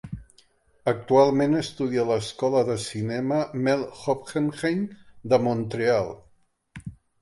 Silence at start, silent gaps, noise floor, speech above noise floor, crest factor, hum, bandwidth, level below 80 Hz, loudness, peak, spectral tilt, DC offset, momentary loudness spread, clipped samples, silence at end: 0.05 s; none; -62 dBFS; 38 dB; 18 dB; none; 11.5 kHz; -56 dBFS; -25 LUFS; -6 dBFS; -6 dB/octave; under 0.1%; 21 LU; under 0.1%; 0.3 s